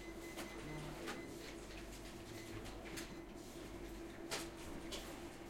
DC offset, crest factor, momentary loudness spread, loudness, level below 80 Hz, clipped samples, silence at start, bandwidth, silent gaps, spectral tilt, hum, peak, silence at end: under 0.1%; 20 dB; 6 LU; -49 LUFS; -58 dBFS; under 0.1%; 0 s; 16.5 kHz; none; -4 dB/octave; none; -28 dBFS; 0 s